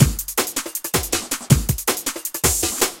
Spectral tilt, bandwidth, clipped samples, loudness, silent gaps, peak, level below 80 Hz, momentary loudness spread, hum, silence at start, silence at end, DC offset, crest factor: -3.5 dB/octave; 17 kHz; under 0.1%; -20 LUFS; none; 0 dBFS; -32 dBFS; 5 LU; none; 0 s; 0 s; under 0.1%; 20 dB